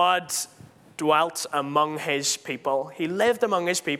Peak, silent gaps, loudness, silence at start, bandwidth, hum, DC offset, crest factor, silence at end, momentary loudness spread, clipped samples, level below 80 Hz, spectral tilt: -6 dBFS; none; -25 LUFS; 0 s; 16.5 kHz; none; under 0.1%; 18 dB; 0 s; 7 LU; under 0.1%; -74 dBFS; -2.5 dB/octave